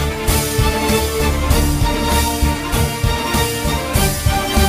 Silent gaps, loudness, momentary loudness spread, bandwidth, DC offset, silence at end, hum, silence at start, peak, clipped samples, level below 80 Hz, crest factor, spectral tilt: none; -17 LUFS; 2 LU; 16 kHz; under 0.1%; 0 s; none; 0 s; -2 dBFS; under 0.1%; -22 dBFS; 14 dB; -4 dB/octave